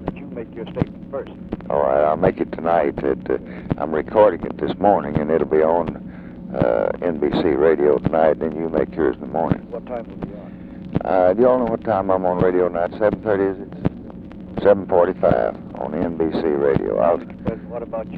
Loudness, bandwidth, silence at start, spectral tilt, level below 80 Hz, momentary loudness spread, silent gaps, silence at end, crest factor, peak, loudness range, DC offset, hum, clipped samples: -20 LUFS; 4.9 kHz; 0 s; -10.5 dB/octave; -42 dBFS; 15 LU; none; 0 s; 18 dB; -2 dBFS; 2 LU; under 0.1%; none; under 0.1%